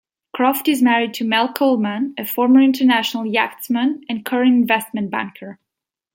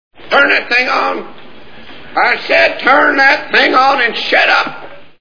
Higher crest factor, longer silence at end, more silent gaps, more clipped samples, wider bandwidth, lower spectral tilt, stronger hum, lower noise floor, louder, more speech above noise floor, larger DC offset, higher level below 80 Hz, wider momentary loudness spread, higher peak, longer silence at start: about the same, 16 dB vs 12 dB; first, 0.6 s vs 0 s; neither; second, under 0.1% vs 0.2%; first, 17 kHz vs 5.4 kHz; first, -4.5 dB/octave vs -3 dB/octave; neither; first, -85 dBFS vs -37 dBFS; second, -17 LUFS vs -10 LUFS; first, 67 dB vs 26 dB; second, under 0.1% vs 3%; second, -70 dBFS vs -54 dBFS; first, 11 LU vs 7 LU; about the same, -2 dBFS vs 0 dBFS; first, 0.35 s vs 0.1 s